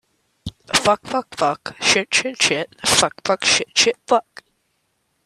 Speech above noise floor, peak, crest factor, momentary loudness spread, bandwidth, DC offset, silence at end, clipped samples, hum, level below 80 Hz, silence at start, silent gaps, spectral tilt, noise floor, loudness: 50 dB; 0 dBFS; 20 dB; 6 LU; 14.5 kHz; under 0.1%; 1.05 s; under 0.1%; none; -54 dBFS; 0.45 s; none; -1 dB/octave; -69 dBFS; -18 LUFS